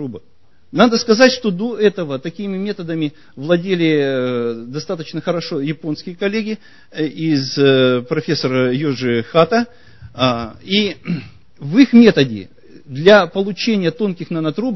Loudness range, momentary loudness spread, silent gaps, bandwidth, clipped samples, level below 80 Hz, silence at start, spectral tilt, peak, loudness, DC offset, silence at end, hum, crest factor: 6 LU; 14 LU; none; 6.2 kHz; under 0.1%; -54 dBFS; 0 s; -6 dB/octave; 0 dBFS; -16 LUFS; 0.7%; 0 s; none; 16 dB